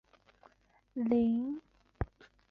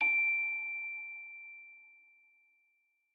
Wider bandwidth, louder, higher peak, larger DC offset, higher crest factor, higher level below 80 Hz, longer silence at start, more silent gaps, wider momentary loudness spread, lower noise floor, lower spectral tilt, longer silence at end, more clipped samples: about the same, 4.5 kHz vs 4.3 kHz; about the same, -34 LUFS vs -33 LUFS; first, -16 dBFS vs -22 dBFS; neither; about the same, 20 dB vs 16 dB; first, -52 dBFS vs under -90 dBFS; first, 0.95 s vs 0 s; neither; second, 15 LU vs 24 LU; second, -69 dBFS vs -77 dBFS; first, -10 dB/octave vs 2.5 dB/octave; second, 0.45 s vs 1.25 s; neither